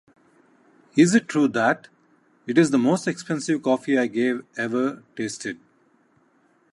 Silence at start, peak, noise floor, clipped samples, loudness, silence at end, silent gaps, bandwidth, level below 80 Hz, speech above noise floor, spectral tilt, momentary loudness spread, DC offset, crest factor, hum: 0.95 s; -4 dBFS; -62 dBFS; under 0.1%; -23 LUFS; 1.2 s; none; 11.5 kHz; -74 dBFS; 40 dB; -5.5 dB/octave; 13 LU; under 0.1%; 18 dB; none